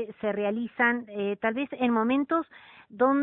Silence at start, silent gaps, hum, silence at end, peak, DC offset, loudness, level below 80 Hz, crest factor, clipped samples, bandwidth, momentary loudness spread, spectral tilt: 0 s; none; none; 0 s; -10 dBFS; under 0.1%; -27 LUFS; -68 dBFS; 18 dB; under 0.1%; 4 kHz; 6 LU; -10 dB/octave